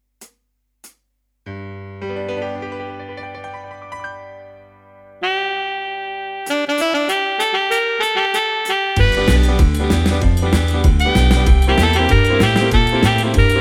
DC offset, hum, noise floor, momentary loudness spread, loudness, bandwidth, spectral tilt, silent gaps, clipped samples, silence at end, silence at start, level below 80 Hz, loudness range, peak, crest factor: under 0.1%; none; -69 dBFS; 18 LU; -16 LUFS; 15.5 kHz; -5.5 dB/octave; none; under 0.1%; 0 s; 0.2 s; -20 dBFS; 15 LU; -2 dBFS; 16 dB